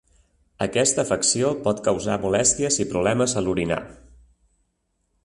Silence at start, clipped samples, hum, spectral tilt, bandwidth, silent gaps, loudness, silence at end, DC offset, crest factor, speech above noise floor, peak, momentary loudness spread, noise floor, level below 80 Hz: 0.6 s; under 0.1%; none; -3.5 dB/octave; 11.5 kHz; none; -22 LUFS; 1.3 s; under 0.1%; 18 dB; 50 dB; -6 dBFS; 6 LU; -72 dBFS; -50 dBFS